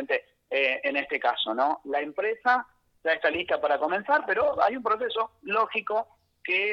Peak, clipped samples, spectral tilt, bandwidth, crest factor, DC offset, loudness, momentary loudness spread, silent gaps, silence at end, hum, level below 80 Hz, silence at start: -10 dBFS; under 0.1%; -5 dB/octave; 6.6 kHz; 18 dB; under 0.1%; -26 LUFS; 6 LU; none; 0 s; none; -68 dBFS; 0 s